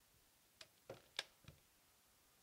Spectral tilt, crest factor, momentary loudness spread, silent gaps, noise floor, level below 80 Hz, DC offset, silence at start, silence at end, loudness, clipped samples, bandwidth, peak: -1.5 dB/octave; 34 dB; 16 LU; none; -74 dBFS; -82 dBFS; under 0.1%; 0 s; 0 s; -54 LUFS; under 0.1%; 16 kHz; -24 dBFS